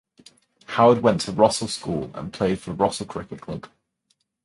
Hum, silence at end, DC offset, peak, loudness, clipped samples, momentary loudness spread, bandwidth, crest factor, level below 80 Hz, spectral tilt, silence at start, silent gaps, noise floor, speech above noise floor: none; 0.8 s; under 0.1%; -2 dBFS; -22 LUFS; under 0.1%; 17 LU; 11.5 kHz; 22 dB; -52 dBFS; -5 dB/octave; 0.7 s; none; -71 dBFS; 49 dB